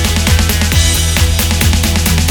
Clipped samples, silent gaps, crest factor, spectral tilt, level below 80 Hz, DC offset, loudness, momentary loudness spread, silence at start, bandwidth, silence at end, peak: under 0.1%; none; 10 dB; -3.5 dB/octave; -16 dBFS; under 0.1%; -11 LUFS; 1 LU; 0 s; over 20 kHz; 0 s; 0 dBFS